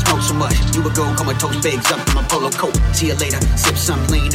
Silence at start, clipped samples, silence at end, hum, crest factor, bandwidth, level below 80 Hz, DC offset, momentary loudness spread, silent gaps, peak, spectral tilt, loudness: 0 s; under 0.1%; 0 s; none; 12 dB; 16.5 kHz; -22 dBFS; under 0.1%; 2 LU; none; -4 dBFS; -4 dB/octave; -17 LUFS